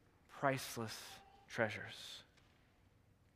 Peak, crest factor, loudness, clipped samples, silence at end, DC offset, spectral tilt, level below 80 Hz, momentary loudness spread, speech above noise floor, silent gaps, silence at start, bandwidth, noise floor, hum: -20 dBFS; 26 dB; -43 LUFS; under 0.1%; 1.15 s; under 0.1%; -4 dB/octave; -76 dBFS; 16 LU; 28 dB; none; 0.3 s; 15.5 kHz; -71 dBFS; none